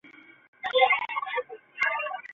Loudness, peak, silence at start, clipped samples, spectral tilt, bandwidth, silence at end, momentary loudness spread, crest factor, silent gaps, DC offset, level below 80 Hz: -26 LUFS; -8 dBFS; 0.05 s; under 0.1%; -1.5 dB/octave; 7.4 kHz; 0 s; 13 LU; 22 dB; 0.48-0.53 s; under 0.1%; -76 dBFS